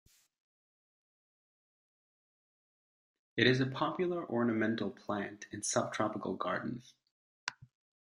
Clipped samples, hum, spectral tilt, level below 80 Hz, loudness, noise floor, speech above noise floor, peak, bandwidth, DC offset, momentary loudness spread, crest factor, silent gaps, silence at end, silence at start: under 0.1%; none; -4.5 dB/octave; -74 dBFS; -35 LUFS; under -90 dBFS; over 56 dB; -12 dBFS; 12.5 kHz; under 0.1%; 15 LU; 26 dB; 7.11-7.47 s; 0.45 s; 3.35 s